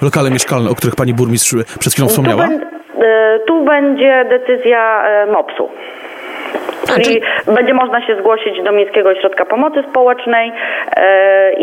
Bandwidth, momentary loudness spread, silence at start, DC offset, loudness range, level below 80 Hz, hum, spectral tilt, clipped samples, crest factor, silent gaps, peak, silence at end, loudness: 16.5 kHz; 10 LU; 0 s; under 0.1%; 3 LU; -52 dBFS; none; -4.5 dB/octave; under 0.1%; 12 dB; none; 0 dBFS; 0 s; -12 LUFS